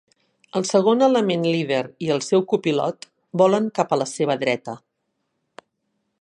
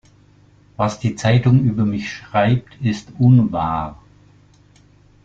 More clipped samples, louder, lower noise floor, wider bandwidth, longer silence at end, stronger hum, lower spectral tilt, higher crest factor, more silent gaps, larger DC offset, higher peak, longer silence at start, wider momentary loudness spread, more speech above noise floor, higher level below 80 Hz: neither; second, -21 LUFS vs -18 LUFS; first, -75 dBFS vs -51 dBFS; first, 11 kHz vs 7.6 kHz; first, 1.45 s vs 1.3 s; second, none vs 50 Hz at -45 dBFS; second, -5 dB/octave vs -7.5 dB/octave; about the same, 18 dB vs 16 dB; neither; neither; about the same, -4 dBFS vs -2 dBFS; second, 0.55 s vs 0.8 s; about the same, 11 LU vs 9 LU; first, 55 dB vs 34 dB; second, -72 dBFS vs -46 dBFS